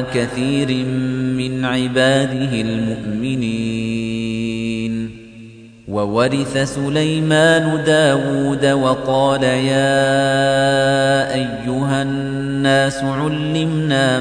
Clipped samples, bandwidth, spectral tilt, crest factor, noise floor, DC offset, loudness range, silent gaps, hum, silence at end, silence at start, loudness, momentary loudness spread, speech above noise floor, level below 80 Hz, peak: under 0.1%; 10 kHz; -5.5 dB/octave; 14 dB; -39 dBFS; under 0.1%; 6 LU; none; none; 0 s; 0 s; -17 LUFS; 7 LU; 22 dB; -46 dBFS; -2 dBFS